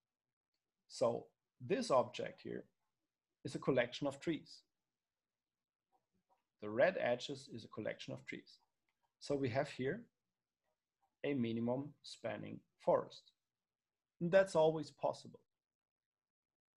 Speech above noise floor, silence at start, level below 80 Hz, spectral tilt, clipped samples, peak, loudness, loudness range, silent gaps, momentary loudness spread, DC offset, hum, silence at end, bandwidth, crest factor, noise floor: over 51 dB; 0.9 s; -78 dBFS; -5.5 dB/octave; under 0.1%; -18 dBFS; -39 LUFS; 6 LU; none; 18 LU; under 0.1%; none; 1.45 s; 11.5 kHz; 22 dB; under -90 dBFS